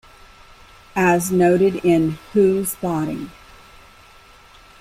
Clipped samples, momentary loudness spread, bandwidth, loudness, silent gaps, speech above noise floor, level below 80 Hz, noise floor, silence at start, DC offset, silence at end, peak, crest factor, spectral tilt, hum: under 0.1%; 12 LU; 16 kHz; -18 LUFS; none; 29 dB; -50 dBFS; -47 dBFS; 0.95 s; under 0.1%; 1.5 s; -4 dBFS; 16 dB; -6 dB/octave; none